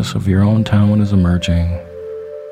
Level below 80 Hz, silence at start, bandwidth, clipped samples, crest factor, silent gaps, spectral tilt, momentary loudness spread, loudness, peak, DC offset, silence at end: -32 dBFS; 0 s; 10.5 kHz; under 0.1%; 14 dB; none; -7.5 dB/octave; 15 LU; -14 LUFS; 0 dBFS; under 0.1%; 0 s